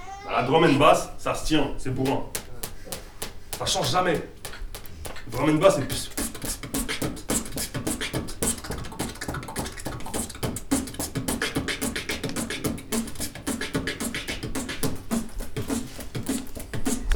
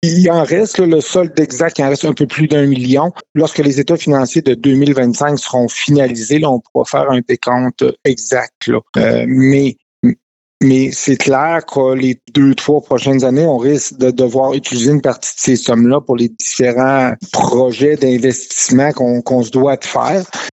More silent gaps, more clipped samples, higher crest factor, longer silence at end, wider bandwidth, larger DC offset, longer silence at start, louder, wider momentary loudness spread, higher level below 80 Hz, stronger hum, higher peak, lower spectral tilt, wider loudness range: second, none vs 3.29-3.35 s, 6.70-6.75 s, 8.55-8.61 s, 8.89-8.94 s, 9.82-10.03 s, 10.23-10.61 s; neither; first, 24 dB vs 12 dB; about the same, 0 s vs 0 s; first, over 20 kHz vs 8.2 kHz; neither; about the same, 0 s vs 0 s; second, -27 LUFS vs -13 LUFS; first, 15 LU vs 5 LU; first, -40 dBFS vs -54 dBFS; neither; about the same, -4 dBFS vs -2 dBFS; second, -4 dB/octave vs -5.5 dB/octave; first, 5 LU vs 1 LU